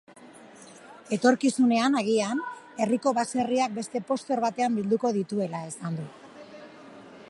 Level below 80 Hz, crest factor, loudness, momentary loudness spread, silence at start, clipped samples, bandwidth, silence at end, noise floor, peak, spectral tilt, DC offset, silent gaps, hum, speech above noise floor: -74 dBFS; 20 dB; -26 LUFS; 24 LU; 0.2 s; under 0.1%; 11.5 kHz; 0 s; -49 dBFS; -8 dBFS; -5 dB/octave; under 0.1%; none; none; 24 dB